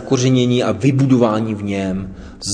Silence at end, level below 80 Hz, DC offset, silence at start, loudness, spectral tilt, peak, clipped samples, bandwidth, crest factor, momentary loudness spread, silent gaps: 0 s; -42 dBFS; under 0.1%; 0 s; -16 LUFS; -6 dB/octave; 0 dBFS; under 0.1%; 10 kHz; 16 dB; 12 LU; none